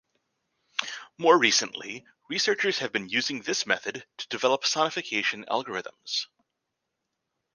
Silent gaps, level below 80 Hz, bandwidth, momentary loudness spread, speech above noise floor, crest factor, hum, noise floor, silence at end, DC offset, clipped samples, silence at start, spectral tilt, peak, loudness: none; -76 dBFS; 10.5 kHz; 15 LU; 55 dB; 24 dB; none; -83 dBFS; 1.3 s; under 0.1%; under 0.1%; 0.8 s; -1.5 dB/octave; -6 dBFS; -26 LUFS